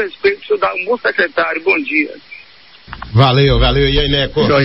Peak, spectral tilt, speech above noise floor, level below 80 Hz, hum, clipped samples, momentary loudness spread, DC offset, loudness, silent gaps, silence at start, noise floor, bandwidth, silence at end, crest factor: 0 dBFS; -8.5 dB/octave; 28 dB; -26 dBFS; none; under 0.1%; 8 LU; 0.3%; -14 LUFS; none; 0 s; -42 dBFS; 5.8 kHz; 0 s; 14 dB